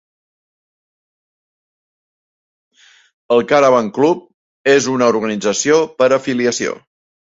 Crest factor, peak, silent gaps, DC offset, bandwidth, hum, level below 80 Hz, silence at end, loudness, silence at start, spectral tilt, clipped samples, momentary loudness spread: 16 dB; -2 dBFS; 4.34-4.65 s; under 0.1%; 8 kHz; none; -62 dBFS; 0.5 s; -15 LUFS; 3.3 s; -4 dB/octave; under 0.1%; 9 LU